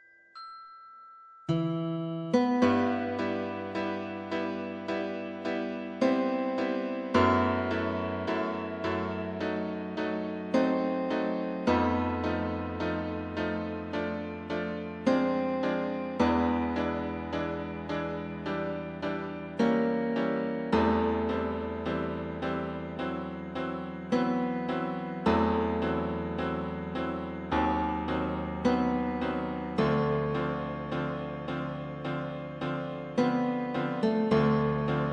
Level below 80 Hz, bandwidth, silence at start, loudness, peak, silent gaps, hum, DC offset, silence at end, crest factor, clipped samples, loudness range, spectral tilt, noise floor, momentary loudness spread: -52 dBFS; 8 kHz; 0.35 s; -30 LUFS; -12 dBFS; none; none; under 0.1%; 0 s; 18 dB; under 0.1%; 3 LU; -7.5 dB/octave; -52 dBFS; 9 LU